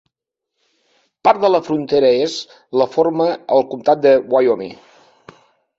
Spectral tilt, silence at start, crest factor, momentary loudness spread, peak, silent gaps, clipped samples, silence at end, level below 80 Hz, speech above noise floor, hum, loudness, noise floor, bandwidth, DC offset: -5.5 dB/octave; 1.25 s; 16 dB; 9 LU; -2 dBFS; none; under 0.1%; 1.05 s; -62 dBFS; 65 dB; none; -16 LUFS; -81 dBFS; 7.8 kHz; under 0.1%